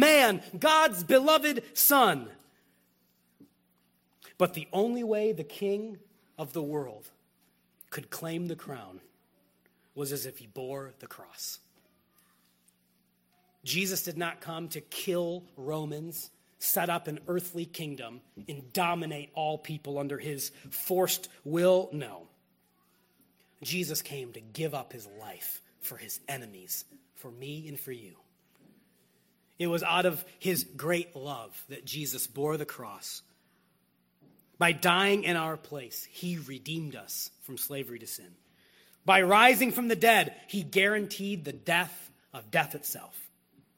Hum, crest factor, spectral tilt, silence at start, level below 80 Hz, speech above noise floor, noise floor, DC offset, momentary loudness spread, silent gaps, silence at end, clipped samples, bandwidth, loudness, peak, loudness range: none; 26 dB; -3.5 dB/octave; 0 s; -76 dBFS; 41 dB; -71 dBFS; under 0.1%; 20 LU; none; 0.5 s; under 0.1%; 16.5 kHz; -29 LUFS; -4 dBFS; 15 LU